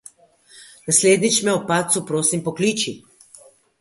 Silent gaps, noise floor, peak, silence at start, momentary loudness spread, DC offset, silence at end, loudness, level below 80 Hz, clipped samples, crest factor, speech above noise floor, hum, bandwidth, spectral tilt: none; -52 dBFS; -2 dBFS; 0.55 s; 11 LU; under 0.1%; 0.8 s; -18 LUFS; -64 dBFS; under 0.1%; 20 dB; 33 dB; none; 12 kHz; -3 dB/octave